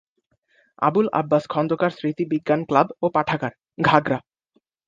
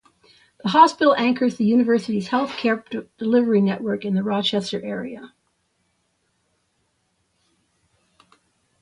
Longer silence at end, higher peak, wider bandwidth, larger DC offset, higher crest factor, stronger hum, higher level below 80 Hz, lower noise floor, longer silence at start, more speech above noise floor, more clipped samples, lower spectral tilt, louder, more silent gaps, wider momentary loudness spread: second, 0.7 s vs 3.55 s; about the same, 0 dBFS vs -2 dBFS; second, 7.6 kHz vs 11 kHz; neither; about the same, 22 dB vs 22 dB; neither; first, -60 dBFS vs -66 dBFS; about the same, -68 dBFS vs -69 dBFS; first, 0.8 s vs 0.65 s; about the same, 47 dB vs 50 dB; neither; first, -7.5 dB/octave vs -6 dB/octave; about the same, -22 LUFS vs -20 LUFS; neither; second, 8 LU vs 14 LU